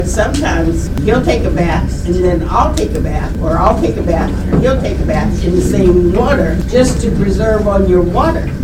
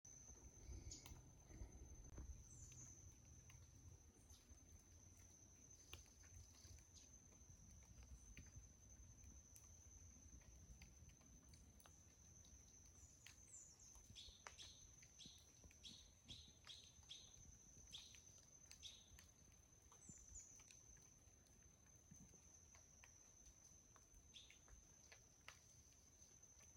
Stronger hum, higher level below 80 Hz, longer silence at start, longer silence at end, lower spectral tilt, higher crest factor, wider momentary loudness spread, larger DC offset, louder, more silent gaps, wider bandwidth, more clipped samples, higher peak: neither; first, -18 dBFS vs -70 dBFS; about the same, 0 s vs 0.05 s; about the same, 0 s vs 0 s; first, -6.5 dB/octave vs -2.5 dB/octave; second, 12 dB vs 28 dB; about the same, 5 LU vs 7 LU; first, 0.1% vs under 0.1%; first, -13 LUFS vs -64 LUFS; neither; about the same, 15.5 kHz vs 16.5 kHz; first, 0.1% vs under 0.1%; first, 0 dBFS vs -36 dBFS